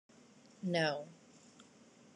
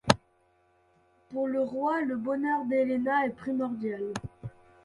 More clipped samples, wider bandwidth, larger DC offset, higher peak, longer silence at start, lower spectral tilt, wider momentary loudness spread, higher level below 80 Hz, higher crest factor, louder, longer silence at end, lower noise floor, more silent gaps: neither; about the same, 11 kHz vs 11.5 kHz; neither; second, -20 dBFS vs -2 dBFS; first, 0.6 s vs 0.05 s; about the same, -5 dB/octave vs -5.5 dB/octave; first, 26 LU vs 12 LU; second, -88 dBFS vs -58 dBFS; second, 22 dB vs 28 dB; second, -37 LUFS vs -30 LUFS; first, 0.55 s vs 0.35 s; second, -62 dBFS vs -67 dBFS; neither